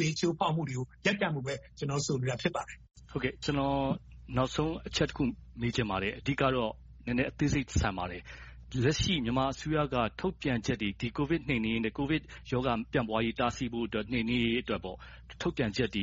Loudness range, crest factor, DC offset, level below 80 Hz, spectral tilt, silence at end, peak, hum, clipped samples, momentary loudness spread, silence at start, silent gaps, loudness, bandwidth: 2 LU; 18 dB; under 0.1%; -48 dBFS; -4.5 dB/octave; 0 s; -14 dBFS; none; under 0.1%; 8 LU; 0 s; none; -32 LUFS; 8 kHz